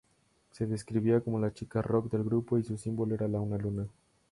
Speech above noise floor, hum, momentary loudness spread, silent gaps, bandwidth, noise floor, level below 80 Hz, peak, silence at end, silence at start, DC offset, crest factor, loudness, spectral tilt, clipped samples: 39 dB; none; 7 LU; none; 11.5 kHz; -70 dBFS; -58 dBFS; -14 dBFS; 0.45 s; 0.55 s; under 0.1%; 18 dB; -32 LUFS; -8.5 dB/octave; under 0.1%